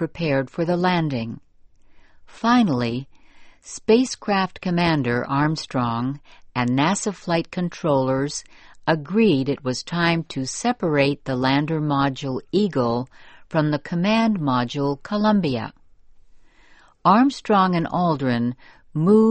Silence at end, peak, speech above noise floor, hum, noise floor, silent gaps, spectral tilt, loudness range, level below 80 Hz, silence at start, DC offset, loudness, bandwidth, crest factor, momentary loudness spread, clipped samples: 0 s; -4 dBFS; 31 dB; none; -51 dBFS; none; -6 dB/octave; 2 LU; -52 dBFS; 0 s; under 0.1%; -22 LUFS; 8.8 kHz; 18 dB; 10 LU; under 0.1%